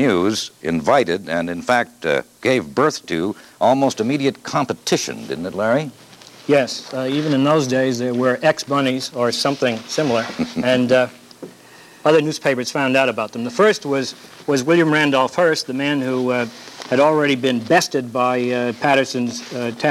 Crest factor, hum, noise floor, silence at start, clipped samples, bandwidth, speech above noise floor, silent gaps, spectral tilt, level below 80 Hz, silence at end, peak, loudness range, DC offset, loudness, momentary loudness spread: 16 dB; none; -44 dBFS; 0 s; under 0.1%; 15.5 kHz; 26 dB; none; -4.5 dB/octave; -60 dBFS; 0 s; -2 dBFS; 3 LU; under 0.1%; -19 LUFS; 8 LU